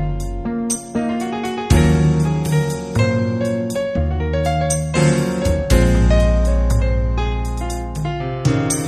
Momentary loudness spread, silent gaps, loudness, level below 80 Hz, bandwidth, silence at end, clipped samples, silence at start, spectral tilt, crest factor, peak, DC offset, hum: 9 LU; none; -18 LUFS; -22 dBFS; 13.5 kHz; 0 s; under 0.1%; 0 s; -6 dB/octave; 16 dB; 0 dBFS; under 0.1%; none